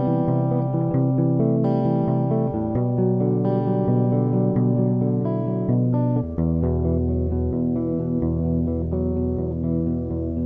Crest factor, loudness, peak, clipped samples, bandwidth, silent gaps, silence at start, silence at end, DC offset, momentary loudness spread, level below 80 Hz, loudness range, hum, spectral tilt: 12 dB; -22 LUFS; -8 dBFS; under 0.1%; 3.3 kHz; none; 0 s; 0 s; under 0.1%; 4 LU; -36 dBFS; 2 LU; none; -13.5 dB/octave